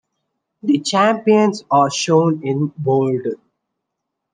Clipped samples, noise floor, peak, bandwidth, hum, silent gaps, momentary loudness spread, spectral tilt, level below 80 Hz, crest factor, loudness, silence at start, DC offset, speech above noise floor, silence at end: under 0.1%; -78 dBFS; -2 dBFS; 10 kHz; none; none; 9 LU; -5.5 dB/octave; -70 dBFS; 16 dB; -17 LUFS; 0.65 s; under 0.1%; 62 dB; 1 s